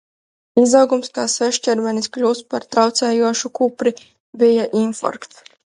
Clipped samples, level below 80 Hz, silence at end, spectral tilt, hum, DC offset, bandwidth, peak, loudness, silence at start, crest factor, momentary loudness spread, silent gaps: under 0.1%; -68 dBFS; 0.55 s; -3.5 dB/octave; none; under 0.1%; 11.5 kHz; 0 dBFS; -17 LUFS; 0.55 s; 18 dB; 8 LU; 4.20-4.33 s